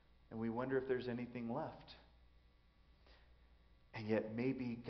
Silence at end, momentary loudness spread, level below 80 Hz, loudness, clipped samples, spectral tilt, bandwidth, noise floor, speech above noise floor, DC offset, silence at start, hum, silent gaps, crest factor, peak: 0 s; 16 LU; -68 dBFS; -42 LUFS; under 0.1%; -6 dB/octave; 6 kHz; -69 dBFS; 28 dB; under 0.1%; 0.3 s; none; none; 20 dB; -26 dBFS